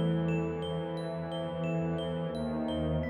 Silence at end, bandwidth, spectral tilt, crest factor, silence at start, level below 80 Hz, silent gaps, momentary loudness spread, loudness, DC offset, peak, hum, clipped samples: 0 s; 11 kHz; -8 dB/octave; 12 dB; 0 s; -50 dBFS; none; 5 LU; -34 LUFS; under 0.1%; -20 dBFS; none; under 0.1%